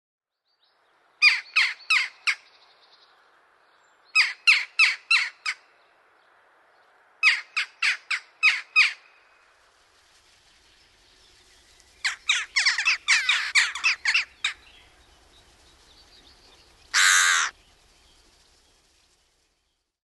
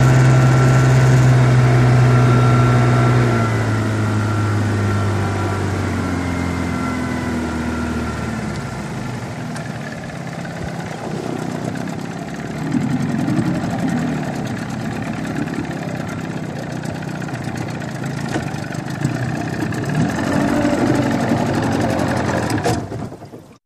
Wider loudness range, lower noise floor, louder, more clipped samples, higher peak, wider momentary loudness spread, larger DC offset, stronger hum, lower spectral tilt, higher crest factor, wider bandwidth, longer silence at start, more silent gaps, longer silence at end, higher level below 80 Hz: second, 5 LU vs 11 LU; first, -75 dBFS vs -38 dBFS; about the same, -21 LUFS vs -19 LUFS; neither; about the same, -4 dBFS vs -2 dBFS; about the same, 12 LU vs 14 LU; neither; neither; second, 4.5 dB/octave vs -7 dB/octave; first, 22 dB vs 16 dB; about the same, 12.5 kHz vs 12.5 kHz; first, 1.2 s vs 0 s; neither; first, 2.55 s vs 0.1 s; second, -68 dBFS vs -38 dBFS